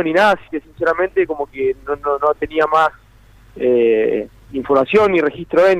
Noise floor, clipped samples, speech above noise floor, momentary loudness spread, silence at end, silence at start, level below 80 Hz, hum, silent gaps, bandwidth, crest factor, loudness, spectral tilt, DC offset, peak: -46 dBFS; under 0.1%; 30 dB; 8 LU; 0 s; 0 s; -46 dBFS; none; none; 11.5 kHz; 12 dB; -17 LUFS; -6 dB/octave; under 0.1%; -4 dBFS